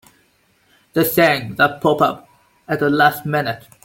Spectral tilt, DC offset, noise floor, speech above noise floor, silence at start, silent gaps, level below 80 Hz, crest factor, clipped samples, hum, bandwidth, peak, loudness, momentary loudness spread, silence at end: -5 dB/octave; under 0.1%; -59 dBFS; 42 dB; 0.95 s; none; -56 dBFS; 18 dB; under 0.1%; none; 17 kHz; -2 dBFS; -17 LUFS; 10 LU; 0.25 s